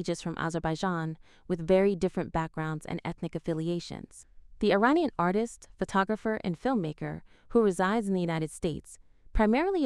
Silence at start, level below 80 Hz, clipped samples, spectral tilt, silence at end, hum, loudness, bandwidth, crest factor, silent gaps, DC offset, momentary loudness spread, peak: 0 s; -46 dBFS; under 0.1%; -6.5 dB/octave; 0 s; none; -30 LUFS; 12 kHz; 20 dB; none; under 0.1%; 13 LU; -10 dBFS